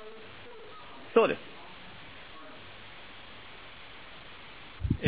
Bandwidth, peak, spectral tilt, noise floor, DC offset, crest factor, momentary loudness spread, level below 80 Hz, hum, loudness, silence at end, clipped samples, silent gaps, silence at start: 4 kHz; -10 dBFS; -4.5 dB/octave; -49 dBFS; 0.3%; 26 dB; 20 LU; -50 dBFS; none; -29 LUFS; 0 s; under 0.1%; none; 0 s